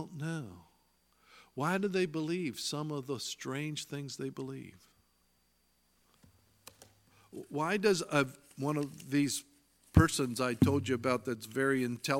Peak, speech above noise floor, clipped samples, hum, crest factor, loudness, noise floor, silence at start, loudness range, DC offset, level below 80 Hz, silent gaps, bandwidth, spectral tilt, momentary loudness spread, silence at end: -8 dBFS; 40 dB; under 0.1%; 60 Hz at -70 dBFS; 26 dB; -33 LUFS; -73 dBFS; 0 s; 14 LU; under 0.1%; -52 dBFS; none; 17 kHz; -5 dB/octave; 13 LU; 0 s